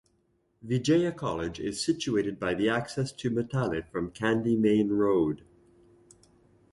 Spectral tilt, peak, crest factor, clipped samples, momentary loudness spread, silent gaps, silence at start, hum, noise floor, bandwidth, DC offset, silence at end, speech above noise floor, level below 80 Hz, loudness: -6 dB/octave; -12 dBFS; 16 dB; under 0.1%; 8 LU; none; 0.65 s; none; -71 dBFS; 11.5 kHz; under 0.1%; 1.35 s; 43 dB; -56 dBFS; -28 LUFS